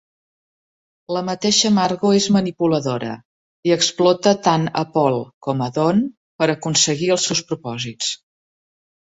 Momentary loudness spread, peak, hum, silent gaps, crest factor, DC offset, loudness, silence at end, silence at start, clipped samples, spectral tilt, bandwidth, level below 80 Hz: 11 LU; -2 dBFS; none; 3.25-3.63 s, 5.34-5.41 s, 6.17-6.39 s; 18 dB; under 0.1%; -19 LUFS; 1 s; 1.1 s; under 0.1%; -4 dB/octave; 8 kHz; -60 dBFS